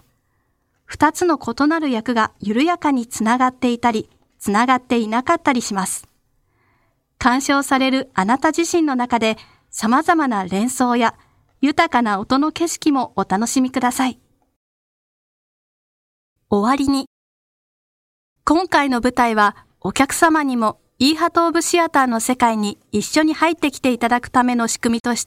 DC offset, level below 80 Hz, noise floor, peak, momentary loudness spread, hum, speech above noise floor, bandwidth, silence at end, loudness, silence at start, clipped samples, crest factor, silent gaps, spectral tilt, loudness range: under 0.1%; -52 dBFS; -66 dBFS; 0 dBFS; 6 LU; none; 49 dB; 16.5 kHz; 0 s; -18 LUFS; 0.9 s; under 0.1%; 18 dB; 14.56-16.36 s, 17.07-18.36 s, 25.00-25.04 s; -3.5 dB/octave; 7 LU